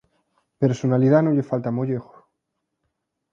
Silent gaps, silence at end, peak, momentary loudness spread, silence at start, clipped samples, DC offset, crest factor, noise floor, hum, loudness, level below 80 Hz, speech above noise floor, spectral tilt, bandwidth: none; 1.3 s; -4 dBFS; 9 LU; 0.6 s; under 0.1%; under 0.1%; 18 dB; -78 dBFS; none; -21 LUFS; -66 dBFS; 59 dB; -9 dB/octave; 7.4 kHz